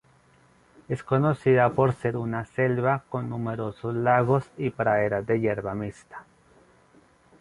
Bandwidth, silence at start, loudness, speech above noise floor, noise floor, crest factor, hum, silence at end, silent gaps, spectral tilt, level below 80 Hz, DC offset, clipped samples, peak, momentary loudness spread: 11 kHz; 0.9 s; -25 LUFS; 34 dB; -59 dBFS; 20 dB; none; 1.2 s; none; -9 dB/octave; -58 dBFS; under 0.1%; under 0.1%; -6 dBFS; 13 LU